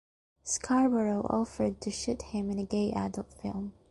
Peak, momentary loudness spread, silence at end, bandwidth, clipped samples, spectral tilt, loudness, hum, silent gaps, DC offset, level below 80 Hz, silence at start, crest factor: -14 dBFS; 11 LU; 0.2 s; 11.5 kHz; under 0.1%; -5 dB/octave; -31 LUFS; none; none; under 0.1%; -54 dBFS; 0.45 s; 18 dB